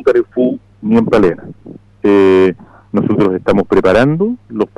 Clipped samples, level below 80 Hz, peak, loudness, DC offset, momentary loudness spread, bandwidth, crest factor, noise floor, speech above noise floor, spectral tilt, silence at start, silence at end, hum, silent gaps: under 0.1%; -40 dBFS; -4 dBFS; -13 LUFS; under 0.1%; 10 LU; 9.6 kHz; 10 dB; -36 dBFS; 25 dB; -8 dB/octave; 0 s; 0.1 s; none; none